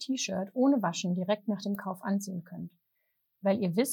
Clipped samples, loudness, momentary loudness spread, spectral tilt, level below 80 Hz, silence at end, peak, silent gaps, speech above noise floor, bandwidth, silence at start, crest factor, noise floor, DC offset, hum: under 0.1%; -31 LUFS; 13 LU; -5 dB/octave; -78 dBFS; 0 s; -14 dBFS; none; 48 dB; 19 kHz; 0 s; 16 dB; -78 dBFS; under 0.1%; none